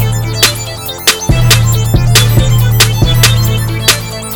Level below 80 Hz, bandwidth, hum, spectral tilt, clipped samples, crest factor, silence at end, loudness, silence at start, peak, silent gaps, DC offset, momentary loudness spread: -20 dBFS; over 20 kHz; none; -3.5 dB/octave; 0.7%; 10 dB; 0 s; -9 LUFS; 0 s; 0 dBFS; none; 0.9%; 5 LU